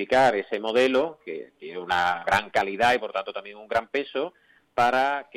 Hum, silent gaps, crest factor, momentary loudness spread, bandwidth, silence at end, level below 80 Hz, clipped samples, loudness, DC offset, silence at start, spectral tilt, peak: none; none; 18 dB; 15 LU; 15.5 kHz; 0.15 s; -62 dBFS; under 0.1%; -24 LUFS; under 0.1%; 0 s; -4 dB/octave; -8 dBFS